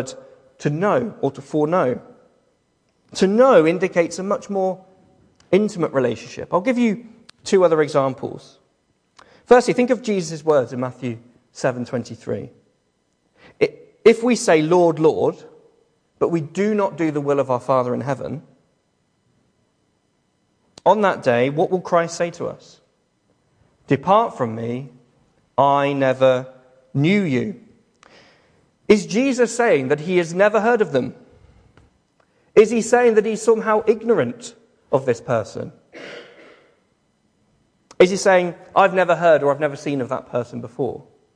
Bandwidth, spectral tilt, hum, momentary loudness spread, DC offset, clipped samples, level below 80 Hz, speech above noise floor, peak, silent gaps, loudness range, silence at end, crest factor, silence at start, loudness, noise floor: 10.5 kHz; -5.5 dB/octave; none; 16 LU; under 0.1%; under 0.1%; -62 dBFS; 49 dB; -2 dBFS; none; 6 LU; 0.35 s; 18 dB; 0 s; -19 LUFS; -67 dBFS